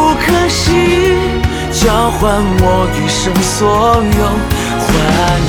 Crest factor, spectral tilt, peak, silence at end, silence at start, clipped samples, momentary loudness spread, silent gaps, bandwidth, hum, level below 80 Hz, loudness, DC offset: 10 dB; -4.5 dB/octave; 0 dBFS; 0 s; 0 s; under 0.1%; 4 LU; none; over 20 kHz; none; -20 dBFS; -12 LUFS; under 0.1%